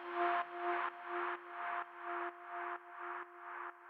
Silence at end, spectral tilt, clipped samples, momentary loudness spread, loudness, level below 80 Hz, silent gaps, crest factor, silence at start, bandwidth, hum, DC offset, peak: 0 s; -4.5 dB/octave; under 0.1%; 10 LU; -42 LUFS; under -90 dBFS; none; 18 dB; 0 s; 5.2 kHz; none; under 0.1%; -24 dBFS